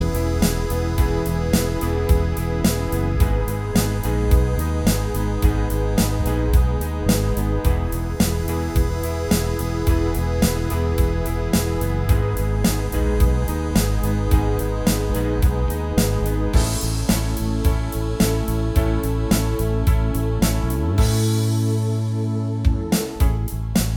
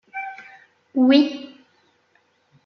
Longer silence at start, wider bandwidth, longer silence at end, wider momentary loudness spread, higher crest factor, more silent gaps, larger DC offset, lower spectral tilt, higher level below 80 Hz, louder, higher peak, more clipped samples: second, 0 s vs 0.15 s; first, 19.5 kHz vs 6.2 kHz; second, 0 s vs 1.2 s; second, 3 LU vs 24 LU; about the same, 16 dB vs 18 dB; neither; neither; about the same, -6 dB/octave vs -5 dB/octave; first, -22 dBFS vs -78 dBFS; about the same, -21 LUFS vs -19 LUFS; about the same, -4 dBFS vs -4 dBFS; neither